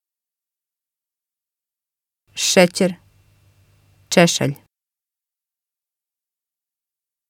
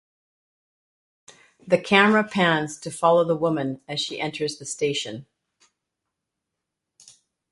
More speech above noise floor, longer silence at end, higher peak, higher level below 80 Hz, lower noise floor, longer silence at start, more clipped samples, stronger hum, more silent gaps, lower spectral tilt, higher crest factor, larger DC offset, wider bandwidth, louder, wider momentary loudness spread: first, 73 dB vs 61 dB; first, 2.75 s vs 2.3 s; about the same, 0 dBFS vs -2 dBFS; about the same, -64 dBFS vs -68 dBFS; first, -89 dBFS vs -83 dBFS; first, 2.35 s vs 1.65 s; neither; neither; neither; about the same, -4 dB/octave vs -4.5 dB/octave; about the same, 24 dB vs 24 dB; neither; first, 16.5 kHz vs 11.5 kHz; first, -17 LUFS vs -22 LUFS; first, 21 LU vs 12 LU